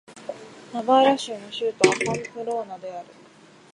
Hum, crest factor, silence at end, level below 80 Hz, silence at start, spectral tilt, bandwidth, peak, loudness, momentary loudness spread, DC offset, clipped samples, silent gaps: none; 24 dB; 0.7 s; -68 dBFS; 0.1 s; -3.5 dB/octave; 11.5 kHz; -2 dBFS; -23 LUFS; 20 LU; under 0.1%; under 0.1%; none